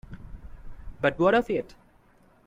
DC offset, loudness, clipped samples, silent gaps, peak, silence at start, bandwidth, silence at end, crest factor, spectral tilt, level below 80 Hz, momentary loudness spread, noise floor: under 0.1%; -25 LUFS; under 0.1%; none; -10 dBFS; 0.1 s; 11 kHz; 0.8 s; 18 dB; -7 dB/octave; -46 dBFS; 25 LU; -59 dBFS